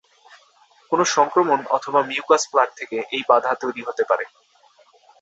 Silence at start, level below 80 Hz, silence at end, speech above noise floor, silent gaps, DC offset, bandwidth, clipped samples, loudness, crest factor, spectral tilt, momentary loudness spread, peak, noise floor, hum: 0.9 s; -72 dBFS; 0.95 s; 36 dB; none; under 0.1%; 8.2 kHz; under 0.1%; -20 LUFS; 20 dB; -2.5 dB/octave; 8 LU; -2 dBFS; -56 dBFS; none